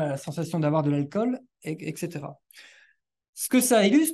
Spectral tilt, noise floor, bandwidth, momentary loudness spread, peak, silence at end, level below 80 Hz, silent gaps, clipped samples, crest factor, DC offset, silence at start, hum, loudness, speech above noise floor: -5 dB/octave; -63 dBFS; 13 kHz; 17 LU; -10 dBFS; 0 s; -72 dBFS; 3.29-3.33 s; under 0.1%; 16 dB; under 0.1%; 0 s; none; -25 LUFS; 38 dB